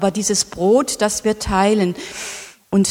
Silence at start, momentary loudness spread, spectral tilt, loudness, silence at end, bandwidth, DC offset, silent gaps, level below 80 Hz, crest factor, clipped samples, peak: 0 s; 12 LU; -4 dB/octave; -18 LUFS; 0 s; 16.5 kHz; under 0.1%; none; -40 dBFS; 16 dB; under 0.1%; -2 dBFS